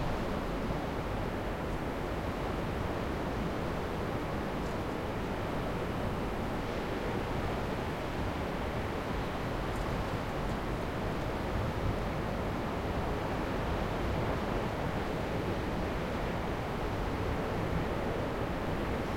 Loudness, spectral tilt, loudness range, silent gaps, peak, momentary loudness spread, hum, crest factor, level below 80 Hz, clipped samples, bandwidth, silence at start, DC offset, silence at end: -35 LUFS; -6.5 dB/octave; 1 LU; none; -20 dBFS; 2 LU; none; 14 dB; -42 dBFS; under 0.1%; 16.5 kHz; 0 s; under 0.1%; 0 s